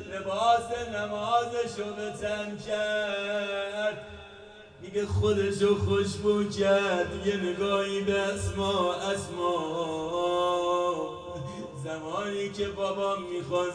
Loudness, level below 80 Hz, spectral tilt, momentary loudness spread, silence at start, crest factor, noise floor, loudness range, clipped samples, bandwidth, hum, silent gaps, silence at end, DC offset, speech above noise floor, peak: -29 LUFS; -56 dBFS; -5 dB/octave; 11 LU; 0 s; 16 dB; -49 dBFS; 5 LU; under 0.1%; 10 kHz; none; none; 0 s; under 0.1%; 20 dB; -12 dBFS